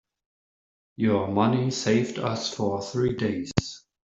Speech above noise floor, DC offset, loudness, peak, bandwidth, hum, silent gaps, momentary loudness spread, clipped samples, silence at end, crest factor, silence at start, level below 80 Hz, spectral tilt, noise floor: over 65 dB; under 0.1%; -26 LUFS; -4 dBFS; 8.2 kHz; none; none; 6 LU; under 0.1%; 0.4 s; 24 dB; 1 s; -54 dBFS; -5.5 dB/octave; under -90 dBFS